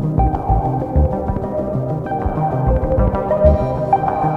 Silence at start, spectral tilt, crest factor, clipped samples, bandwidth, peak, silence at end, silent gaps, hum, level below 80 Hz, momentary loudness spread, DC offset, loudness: 0 s; -11 dB/octave; 16 dB; under 0.1%; 4.6 kHz; 0 dBFS; 0 s; none; none; -22 dBFS; 7 LU; under 0.1%; -18 LUFS